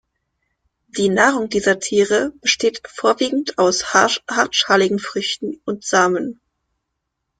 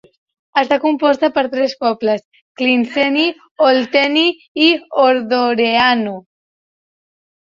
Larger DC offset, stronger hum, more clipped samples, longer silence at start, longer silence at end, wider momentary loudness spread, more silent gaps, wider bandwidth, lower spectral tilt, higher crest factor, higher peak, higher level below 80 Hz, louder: neither; neither; neither; first, 0.95 s vs 0.55 s; second, 1.1 s vs 1.35 s; about the same, 9 LU vs 7 LU; second, none vs 2.25-2.32 s, 2.41-2.55 s, 3.51-3.56 s, 4.48-4.55 s; first, 9.6 kHz vs 7.4 kHz; second, -2.5 dB/octave vs -4.5 dB/octave; about the same, 18 dB vs 14 dB; about the same, -2 dBFS vs -2 dBFS; about the same, -58 dBFS vs -62 dBFS; second, -18 LUFS vs -15 LUFS